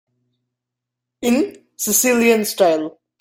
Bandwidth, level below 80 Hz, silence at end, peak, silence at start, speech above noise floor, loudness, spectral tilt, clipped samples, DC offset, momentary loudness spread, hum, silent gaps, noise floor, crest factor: 17 kHz; -60 dBFS; 0.3 s; -2 dBFS; 1.2 s; 66 dB; -17 LUFS; -2.5 dB/octave; under 0.1%; under 0.1%; 11 LU; none; none; -83 dBFS; 18 dB